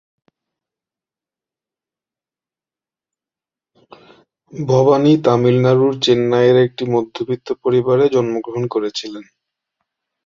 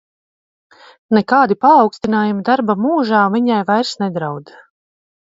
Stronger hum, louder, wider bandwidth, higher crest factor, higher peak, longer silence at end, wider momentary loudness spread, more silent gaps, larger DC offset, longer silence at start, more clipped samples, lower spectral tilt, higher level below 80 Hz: neither; about the same, -15 LUFS vs -15 LUFS; about the same, 7.4 kHz vs 7.8 kHz; about the same, 16 dB vs 16 dB; about the same, -2 dBFS vs 0 dBFS; about the same, 1.05 s vs 0.95 s; about the same, 12 LU vs 10 LU; neither; neither; first, 4.55 s vs 1.1 s; neither; about the same, -7 dB/octave vs -6.5 dB/octave; about the same, -58 dBFS vs -60 dBFS